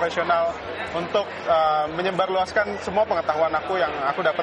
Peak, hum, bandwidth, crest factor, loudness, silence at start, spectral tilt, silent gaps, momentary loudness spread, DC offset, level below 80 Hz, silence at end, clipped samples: -8 dBFS; none; 9.8 kHz; 16 dB; -23 LUFS; 0 s; -5 dB/octave; none; 4 LU; under 0.1%; -54 dBFS; 0 s; under 0.1%